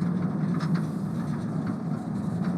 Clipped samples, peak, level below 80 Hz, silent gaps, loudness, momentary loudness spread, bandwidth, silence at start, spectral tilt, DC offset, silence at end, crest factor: under 0.1%; -16 dBFS; -60 dBFS; none; -29 LUFS; 4 LU; 11 kHz; 0 s; -8.5 dB/octave; under 0.1%; 0 s; 12 dB